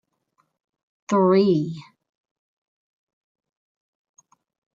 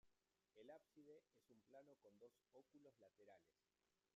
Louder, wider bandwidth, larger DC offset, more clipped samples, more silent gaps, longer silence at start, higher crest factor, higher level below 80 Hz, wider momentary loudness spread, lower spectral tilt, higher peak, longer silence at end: first, -20 LUFS vs -68 LUFS; about the same, 7.6 kHz vs 7.2 kHz; neither; neither; neither; first, 1.1 s vs 0.05 s; about the same, 20 dB vs 20 dB; first, -72 dBFS vs under -90 dBFS; first, 15 LU vs 3 LU; first, -7.5 dB/octave vs -4.5 dB/octave; first, -8 dBFS vs -50 dBFS; first, 2.95 s vs 0.05 s